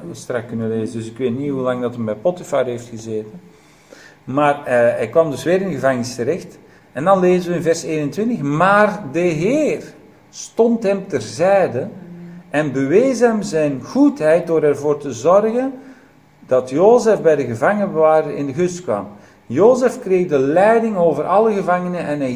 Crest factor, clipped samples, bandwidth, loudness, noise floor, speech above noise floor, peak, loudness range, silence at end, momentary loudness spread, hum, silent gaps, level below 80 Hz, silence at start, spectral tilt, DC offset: 18 dB; under 0.1%; 15.5 kHz; -17 LUFS; -48 dBFS; 31 dB; 0 dBFS; 5 LU; 0 s; 12 LU; none; none; -58 dBFS; 0 s; -6.5 dB/octave; under 0.1%